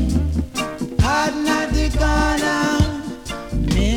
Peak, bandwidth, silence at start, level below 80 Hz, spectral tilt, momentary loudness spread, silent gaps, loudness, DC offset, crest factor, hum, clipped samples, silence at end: -2 dBFS; 16.5 kHz; 0 s; -24 dBFS; -5 dB/octave; 8 LU; none; -20 LUFS; under 0.1%; 18 dB; none; under 0.1%; 0 s